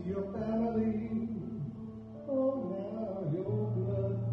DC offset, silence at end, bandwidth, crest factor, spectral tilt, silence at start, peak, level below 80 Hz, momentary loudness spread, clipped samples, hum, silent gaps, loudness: under 0.1%; 0 s; 5.6 kHz; 12 dB; -11.5 dB/octave; 0 s; -22 dBFS; -58 dBFS; 9 LU; under 0.1%; none; none; -35 LUFS